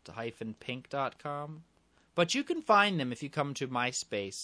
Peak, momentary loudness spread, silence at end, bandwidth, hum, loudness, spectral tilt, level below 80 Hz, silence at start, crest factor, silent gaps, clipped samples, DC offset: -12 dBFS; 16 LU; 0 s; 11 kHz; none; -32 LUFS; -4 dB/octave; -74 dBFS; 0.05 s; 22 dB; none; under 0.1%; under 0.1%